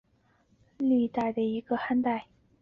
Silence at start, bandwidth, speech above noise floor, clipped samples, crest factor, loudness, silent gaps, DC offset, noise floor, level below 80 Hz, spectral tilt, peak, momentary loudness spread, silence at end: 0.8 s; 5.4 kHz; 40 dB; under 0.1%; 14 dB; -29 LUFS; none; under 0.1%; -67 dBFS; -66 dBFS; -8 dB/octave; -16 dBFS; 5 LU; 0.4 s